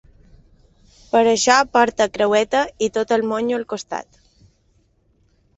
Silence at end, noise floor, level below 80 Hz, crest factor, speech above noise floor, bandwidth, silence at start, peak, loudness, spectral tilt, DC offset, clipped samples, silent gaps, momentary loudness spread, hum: 1.55 s; -61 dBFS; -54 dBFS; 20 dB; 43 dB; 8.2 kHz; 1.15 s; 0 dBFS; -18 LUFS; -2.5 dB/octave; under 0.1%; under 0.1%; none; 13 LU; none